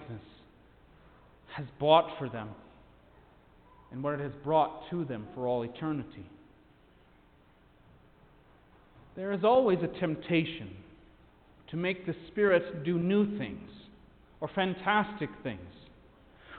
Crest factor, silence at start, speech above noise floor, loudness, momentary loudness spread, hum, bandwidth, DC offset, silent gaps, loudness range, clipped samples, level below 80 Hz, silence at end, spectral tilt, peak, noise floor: 24 dB; 0 s; 31 dB; -31 LUFS; 22 LU; none; 4.6 kHz; under 0.1%; none; 7 LU; under 0.1%; -62 dBFS; 0 s; -10 dB/octave; -8 dBFS; -62 dBFS